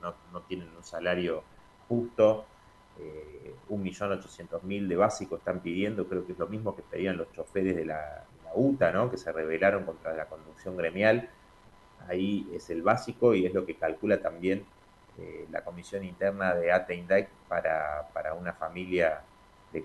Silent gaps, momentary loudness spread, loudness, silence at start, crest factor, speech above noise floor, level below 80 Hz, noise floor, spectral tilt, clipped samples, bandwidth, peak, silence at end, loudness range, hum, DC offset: none; 15 LU; -30 LUFS; 0 s; 22 dB; 26 dB; -60 dBFS; -56 dBFS; -6.5 dB/octave; under 0.1%; 12 kHz; -10 dBFS; 0 s; 3 LU; none; under 0.1%